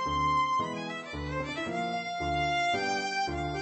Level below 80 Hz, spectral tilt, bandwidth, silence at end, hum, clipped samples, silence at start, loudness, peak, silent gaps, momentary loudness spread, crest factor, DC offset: -48 dBFS; -4.5 dB/octave; 8.8 kHz; 0 s; none; under 0.1%; 0 s; -30 LUFS; -20 dBFS; none; 8 LU; 12 dB; under 0.1%